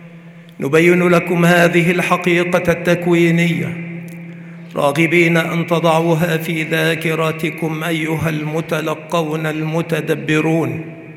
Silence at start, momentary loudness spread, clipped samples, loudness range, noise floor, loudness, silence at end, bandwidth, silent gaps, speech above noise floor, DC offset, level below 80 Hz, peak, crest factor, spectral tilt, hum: 0 s; 12 LU; under 0.1%; 5 LU; -38 dBFS; -16 LUFS; 0 s; 16 kHz; none; 23 dB; under 0.1%; -52 dBFS; 0 dBFS; 16 dB; -6 dB/octave; none